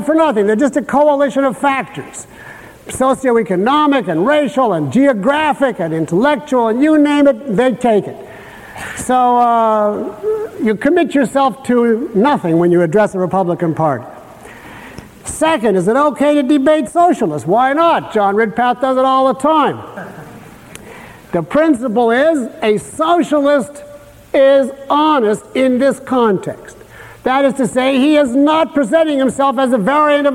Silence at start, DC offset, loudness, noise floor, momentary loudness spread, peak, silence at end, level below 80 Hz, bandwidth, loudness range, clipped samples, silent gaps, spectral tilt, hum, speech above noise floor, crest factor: 0 s; under 0.1%; -13 LUFS; -36 dBFS; 16 LU; -2 dBFS; 0 s; -50 dBFS; 15.5 kHz; 3 LU; under 0.1%; none; -5.5 dB/octave; none; 23 dB; 12 dB